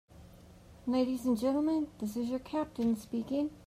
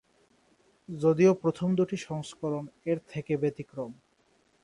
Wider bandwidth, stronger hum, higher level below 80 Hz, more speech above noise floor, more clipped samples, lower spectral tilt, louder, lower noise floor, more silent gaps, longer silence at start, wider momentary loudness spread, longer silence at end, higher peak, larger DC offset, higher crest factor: first, 15.5 kHz vs 11 kHz; neither; first, -60 dBFS vs -68 dBFS; second, 23 dB vs 40 dB; neither; about the same, -6.5 dB/octave vs -7.5 dB/octave; second, -33 LUFS vs -29 LUFS; second, -55 dBFS vs -68 dBFS; neither; second, 0.15 s vs 0.9 s; second, 6 LU vs 16 LU; second, 0 s vs 0.7 s; second, -20 dBFS vs -10 dBFS; neither; second, 14 dB vs 20 dB